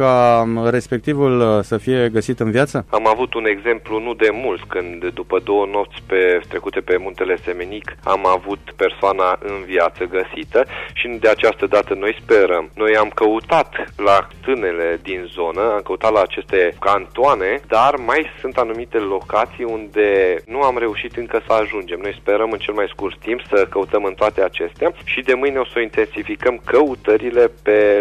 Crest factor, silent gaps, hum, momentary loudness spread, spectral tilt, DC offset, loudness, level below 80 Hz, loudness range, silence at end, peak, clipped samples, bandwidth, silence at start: 14 dB; none; none; 8 LU; -6 dB/octave; under 0.1%; -18 LUFS; -44 dBFS; 3 LU; 0 s; -4 dBFS; under 0.1%; 11.5 kHz; 0 s